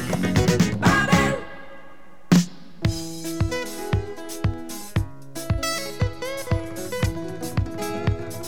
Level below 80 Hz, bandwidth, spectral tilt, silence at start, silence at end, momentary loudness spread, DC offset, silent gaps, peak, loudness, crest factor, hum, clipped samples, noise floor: -38 dBFS; 19.5 kHz; -5.5 dB/octave; 0 s; 0 s; 12 LU; 1%; none; -4 dBFS; -24 LUFS; 20 dB; none; under 0.1%; -49 dBFS